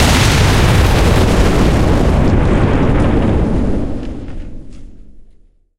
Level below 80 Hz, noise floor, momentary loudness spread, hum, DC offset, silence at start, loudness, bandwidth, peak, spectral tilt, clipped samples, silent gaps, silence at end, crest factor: -16 dBFS; -45 dBFS; 16 LU; none; under 0.1%; 0 s; -13 LUFS; 16 kHz; 0 dBFS; -5.5 dB/octave; under 0.1%; none; 0.5 s; 12 dB